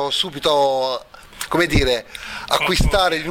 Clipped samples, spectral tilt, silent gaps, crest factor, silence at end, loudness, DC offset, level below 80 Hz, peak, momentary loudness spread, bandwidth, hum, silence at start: under 0.1%; -4 dB/octave; none; 16 dB; 0 s; -19 LUFS; under 0.1%; -28 dBFS; -2 dBFS; 13 LU; 18 kHz; none; 0 s